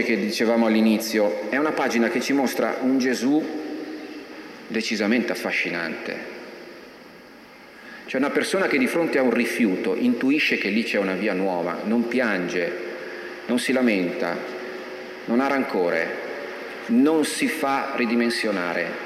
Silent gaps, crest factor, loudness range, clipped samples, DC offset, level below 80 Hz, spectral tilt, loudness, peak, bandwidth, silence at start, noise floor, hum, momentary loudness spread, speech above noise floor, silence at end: none; 16 dB; 5 LU; under 0.1%; under 0.1%; -70 dBFS; -4.5 dB/octave; -23 LUFS; -8 dBFS; 14.5 kHz; 0 s; -45 dBFS; none; 14 LU; 23 dB; 0 s